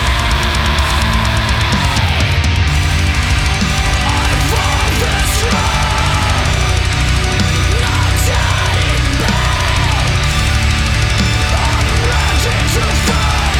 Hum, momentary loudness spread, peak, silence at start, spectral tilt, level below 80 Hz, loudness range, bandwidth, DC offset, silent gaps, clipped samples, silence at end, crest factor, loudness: none; 1 LU; -2 dBFS; 0 s; -4 dB/octave; -18 dBFS; 0 LU; 17 kHz; under 0.1%; none; under 0.1%; 0 s; 12 dB; -13 LUFS